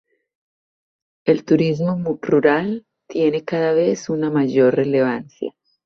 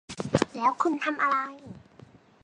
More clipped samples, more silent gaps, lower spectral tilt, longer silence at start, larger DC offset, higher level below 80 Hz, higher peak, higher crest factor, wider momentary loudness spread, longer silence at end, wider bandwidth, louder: neither; neither; first, -7 dB/octave vs -5 dB/octave; first, 1.25 s vs 0.1 s; neither; about the same, -62 dBFS vs -58 dBFS; first, -2 dBFS vs -6 dBFS; second, 16 dB vs 22 dB; second, 12 LU vs 16 LU; second, 0.35 s vs 0.65 s; second, 7 kHz vs 11 kHz; first, -19 LUFS vs -27 LUFS